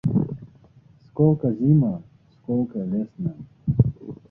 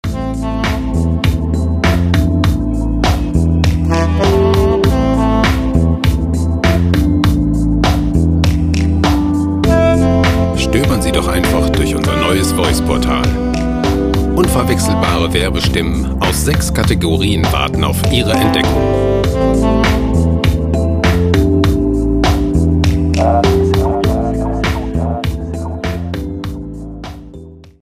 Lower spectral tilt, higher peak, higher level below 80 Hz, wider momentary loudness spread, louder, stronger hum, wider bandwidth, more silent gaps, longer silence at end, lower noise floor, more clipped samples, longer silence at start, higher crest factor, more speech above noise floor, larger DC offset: first, -13.5 dB/octave vs -6 dB/octave; second, -4 dBFS vs 0 dBFS; second, -46 dBFS vs -20 dBFS; first, 17 LU vs 6 LU; second, -23 LUFS vs -14 LUFS; neither; second, 1.8 kHz vs 15.5 kHz; neither; about the same, 0.15 s vs 0.2 s; first, -53 dBFS vs -34 dBFS; neither; about the same, 0.05 s vs 0.05 s; first, 20 dB vs 12 dB; first, 31 dB vs 22 dB; neither